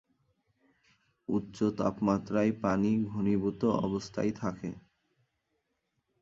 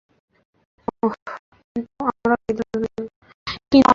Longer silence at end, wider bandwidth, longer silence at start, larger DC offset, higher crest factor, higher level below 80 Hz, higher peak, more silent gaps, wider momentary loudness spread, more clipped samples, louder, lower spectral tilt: first, 1.45 s vs 0 s; about the same, 7.6 kHz vs 7.6 kHz; first, 1.3 s vs 1.05 s; neither; about the same, 20 dB vs 20 dB; second, -60 dBFS vs -52 dBFS; second, -12 dBFS vs -2 dBFS; second, none vs 1.22-1.26 s, 1.39-1.52 s, 1.64-1.75 s, 3.16-3.22 s, 3.34-3.46 s; second, 9 LU vs 15 LU; neither; second, -31 LUFS vs -24 LUFS; first, -7.5 dB/octave vs -6 dB/octave